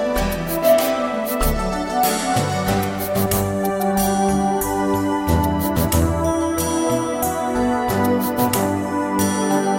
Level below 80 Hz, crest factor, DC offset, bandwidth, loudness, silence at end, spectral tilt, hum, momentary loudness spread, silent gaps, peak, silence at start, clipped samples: -32 dBFS; 16 dB; under 0.1%; 17 kHz; -19 LUFS; 0 s; -5 dB/octave; none; 3 LU; none; -4 dBFS; 0 s; under 0.1%